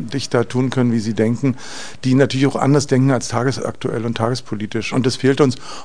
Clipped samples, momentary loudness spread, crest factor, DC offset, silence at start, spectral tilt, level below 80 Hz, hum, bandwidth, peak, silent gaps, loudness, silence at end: under 0.1%; 8 LU; 18 dB; 2%; 0 s; -6 dB/octave; -52 dBFS; none; 10 kHz; 0 dBFS; none; -18 LUFS; 0 s